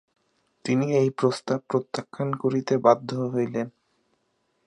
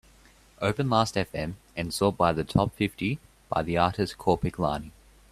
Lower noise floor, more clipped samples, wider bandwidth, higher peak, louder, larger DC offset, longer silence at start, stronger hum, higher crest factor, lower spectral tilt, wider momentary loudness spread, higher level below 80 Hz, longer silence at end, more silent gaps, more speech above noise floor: first, -72 dBFS vs -57 dBFS; neither; second, 11 kHz vs 15 kHz; about the same, -4 dBFS vs -6 dBFS; about the same, -25 LUFS vs -27 LUFS; neither; about the same, 0.65 s vs 0.6 s; neither; about the same, 22 dB vs 22 dB; about the same, -7 dB/octave vs -6 dB/octave; about the same, 11 LU vs 11 LU; second, -72 dBFS vs -48 dBFS; first, 1 s vs 0.4 s; neither; first, 48 dB vs 30 dB